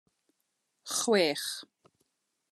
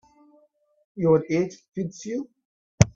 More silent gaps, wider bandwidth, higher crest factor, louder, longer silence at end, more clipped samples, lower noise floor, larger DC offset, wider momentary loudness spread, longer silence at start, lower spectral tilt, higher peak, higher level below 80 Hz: second, none vs 1.68-1.72 s, 2.45-2.78 s; first, 13 kHz vs 9 kHz; about the same, 20 dB vs 24 dB; second, -29 LUFS vs -25 LUFS; first, 0.85 s vs 0.05 s; neither; first, -80 dBFS vs -62 dBFS; neither; about the same, 16 LU vs 15 LU; about the same, 0.85 s vs 0.95 s; second, -2.5 dB/octave vs -6.5 dB/octave; second, -14 dBFS vs 0 dBFS; second, under -90 dBFS vs -46 dBFS